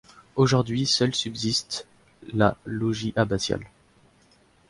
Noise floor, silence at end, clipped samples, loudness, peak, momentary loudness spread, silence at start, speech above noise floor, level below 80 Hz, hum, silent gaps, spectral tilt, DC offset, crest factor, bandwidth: -60 dBFS; 1.05 s; under 0.1%; -25 LUFS; -4 dBFS; 11 LU; 0.35 s; 35 dB; -52 dBFS; none; none; -4.5 dB/octave; under 0.1%; 22 dB; 11.5 kHz